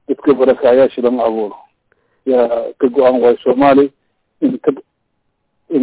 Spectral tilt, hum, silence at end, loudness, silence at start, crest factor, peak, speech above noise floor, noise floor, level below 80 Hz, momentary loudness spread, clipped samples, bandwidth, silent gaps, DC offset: -10 dB/octave; none; 0 s; -13 LUFS; 0.1 s; 12 dB; -2 dBFS; 55 dB; -67 dBFS; -54 dBFS; 9 LU; under 0.1%; 4 kHz; none; under 0.1%